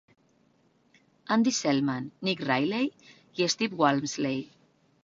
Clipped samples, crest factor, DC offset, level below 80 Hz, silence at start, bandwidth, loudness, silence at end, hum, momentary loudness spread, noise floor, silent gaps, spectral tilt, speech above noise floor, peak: under 0.1%; 22 dB; under 0.1%; -70 dBFS; 1.3 s; 7.8 kHz; -28 LUFS; 0.6 s; none; 10 LU; -66 dBFS; none; -4 dB/octave; 39 dB; -8 dBFS